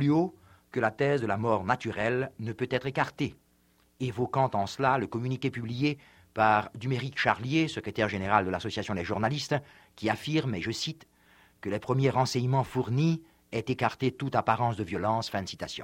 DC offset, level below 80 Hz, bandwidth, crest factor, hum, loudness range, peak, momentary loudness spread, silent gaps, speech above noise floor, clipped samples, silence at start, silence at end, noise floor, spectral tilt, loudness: under 0.1%; -60 dBFS; 15.5 kHz; 22 dB; none; 3 LU; -6 dBFS; 9 LU; none; 37 dB; under 0.1%; 0 s; 0 s; -66 dBFS; -6 dB/octave; -29 LUFS